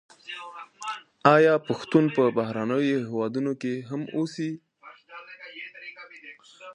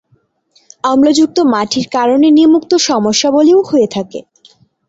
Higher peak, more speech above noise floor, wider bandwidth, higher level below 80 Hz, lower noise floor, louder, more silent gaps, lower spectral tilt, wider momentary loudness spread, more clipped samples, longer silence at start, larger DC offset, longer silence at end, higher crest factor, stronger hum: about the same, -2 dBFS vs 0 dBFS; second, 26 dB vs 46 dB; first, 10.5 kHz vs 8 kHz; second, -74 dBFS vs -54 dBFS; second, -51 dBFS vs -56 dBFS; second, -25 LUFS vs -11 LUFS; neither; first, -6.5 dB/octave vs -4 dB/octave; first, 23 LU vs 9 LU; neither; second, 0.25 s vs 0.85 s; neither; second, 0 s vs 0.65 s; first, 24 dB vs 12 dB; neither